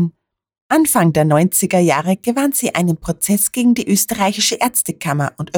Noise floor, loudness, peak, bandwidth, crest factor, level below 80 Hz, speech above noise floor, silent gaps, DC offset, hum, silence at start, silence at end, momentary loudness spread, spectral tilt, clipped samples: -45 dBFS; -15 LUFS; -2 dBFS; over 20 kHz; 14 dB; -48 dBFS; 29 dB; 0.61-0.70 s; under 0.1%; none; 0 s; 0 s; 6 LU; -4.5 dB/octave; under 0.1%